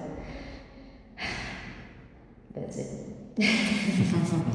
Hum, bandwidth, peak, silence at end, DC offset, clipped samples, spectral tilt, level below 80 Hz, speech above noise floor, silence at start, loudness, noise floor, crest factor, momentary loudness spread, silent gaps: none; 10.5 kHz; -12 dBFS; 0 s; under 0.1%; under 0.1%; -5.5 dB/octave; -50 dBFS; 24 dB; 0 s; -29 LUFS; -51 dBFS; 18 dB; 22 LU; none